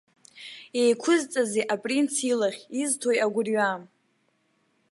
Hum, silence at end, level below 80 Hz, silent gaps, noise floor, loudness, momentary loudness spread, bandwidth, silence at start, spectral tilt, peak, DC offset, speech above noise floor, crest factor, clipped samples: none; 1.05 s; -82 dBFS; none; -70 dBFS; -25 LUFS; 11 LU; 11.5 kHz; 0.35 s; -3 dB/octave; -10 dBFS; under 0.1%; 45 dB; 16 dB; under 0.1%